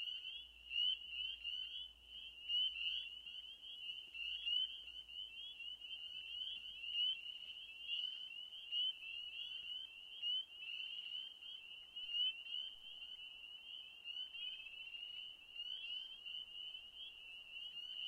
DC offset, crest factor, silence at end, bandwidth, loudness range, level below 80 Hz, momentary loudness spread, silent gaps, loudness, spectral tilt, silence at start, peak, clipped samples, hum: under 0.1%; 18 dB; 0 s; 16 kHz; 6 LU; -78 dBFS; 13 LU; none; -44 LUFS; 1 dB/octave; 0 s; -30 dBFS; under 0.1%; none